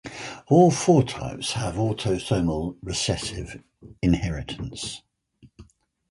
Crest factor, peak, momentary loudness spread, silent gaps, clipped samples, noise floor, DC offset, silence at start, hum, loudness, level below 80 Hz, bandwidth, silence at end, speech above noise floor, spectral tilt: 18 dB; -6 dBFS; 18 LU; none; under 0.1%; -56 dBFS; under 0.1%; 0.05 s; none; -24 LUFS; -42 dBFS; 11.5 kHz; 0.5 s; 33 dB; -5.5 dB/octave